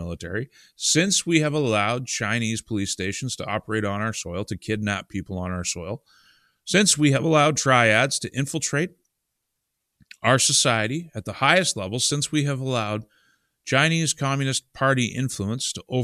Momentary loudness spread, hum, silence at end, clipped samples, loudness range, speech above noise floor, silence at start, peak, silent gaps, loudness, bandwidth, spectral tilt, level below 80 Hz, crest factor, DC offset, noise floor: 13 LU; none; 0 s; under 0.1%; 7 LU; 56 dB; 0 s; 0 dBFS; none; -22 LUFS; 14.5 kHz; -3.5 dB/octave; -56 dBFS; 24 dB; under 0.1%; -79 dBFS